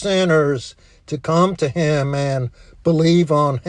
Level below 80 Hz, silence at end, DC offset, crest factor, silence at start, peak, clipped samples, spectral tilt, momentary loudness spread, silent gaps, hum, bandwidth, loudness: -48 dBFS; 0 s; under 0.1%; 14 dB; 0 s; -4 dBFS; under 0.1%; -6.5 dB/octave; 12 LU; none; none; 10 kHz; -18 LUFS